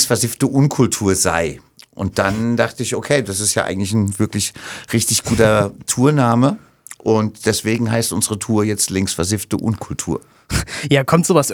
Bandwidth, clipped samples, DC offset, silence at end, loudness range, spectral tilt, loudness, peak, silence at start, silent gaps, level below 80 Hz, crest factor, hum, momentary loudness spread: over 20 kHz; under 0.1%; under 0.1%; 0 s; 2 LU; -4.5 dB/octave; -17 LUFS; 0 dBFS; 0 s; none; -42 dBFS; 18 dB; none; 9 LU